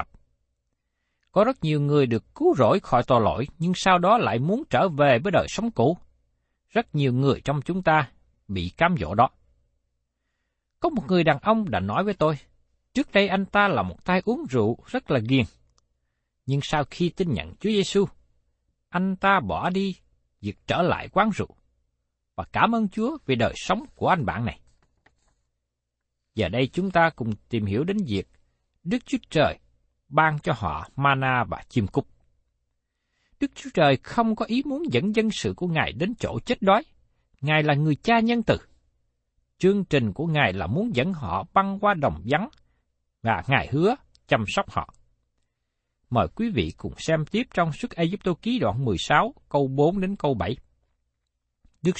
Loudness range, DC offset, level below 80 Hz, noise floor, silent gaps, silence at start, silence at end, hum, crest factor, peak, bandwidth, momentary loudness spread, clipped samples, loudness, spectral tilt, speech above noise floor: 5 LU; under 0.1%; -50 dBFS; -81 dBFS; none; 0 s; 0 s; none; 22 dB; -4 dBFS; 8.8 kHz; 10 LU; under 0.1%; -24 LUFS; -6.5 dB/octave; 58 dB